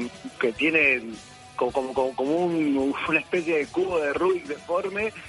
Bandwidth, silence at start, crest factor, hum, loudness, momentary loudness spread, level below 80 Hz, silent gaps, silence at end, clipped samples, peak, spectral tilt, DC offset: 11.5 kHz; 0 s; 18 dB; none; -24 LUFS; 9 LU; -58 dBFS; none; 0 s; under 0.1%; -8 dBFS; -5 dB/octave; under 0.1%